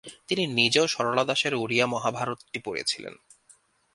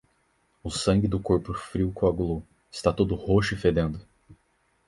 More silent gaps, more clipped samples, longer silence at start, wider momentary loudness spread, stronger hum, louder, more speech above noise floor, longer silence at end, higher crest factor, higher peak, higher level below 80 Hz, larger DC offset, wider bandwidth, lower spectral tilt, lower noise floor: neither; neither; second, 0.05 s vs 0.65 s; about the same, 12 LU vs 11 LU; neither; about the same, -25 LUFS vs -26 LUFS; second, 34 dB vs 44 dB; first, 0.8 s vs 0.55 s; about the same, 22 dB vs 20 dB; about the same, -4 dBFS vs -6 dBFS; second, -68 dBFS vs -42 dBFS; neither; about the same, 11.5 kHz vs 11.5 kHz; second, -3 dB/octave vs -6.5 dB/octave; second, -60 dBFS vs -69 dBFS